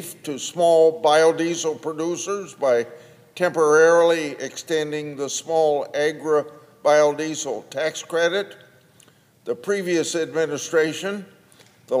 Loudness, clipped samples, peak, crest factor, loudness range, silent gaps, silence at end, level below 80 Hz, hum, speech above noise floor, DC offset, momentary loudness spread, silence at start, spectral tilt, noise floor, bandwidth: -21 LUFS; under 0.1%; -4 dBFS; 18 dB; 5 LU; none; 0 s; -78 dBFS; none; 34 dB; under 0.1%; 13 LU; 0 s; -3.5 dB/octave; -55 dBFS; 15.5 kHz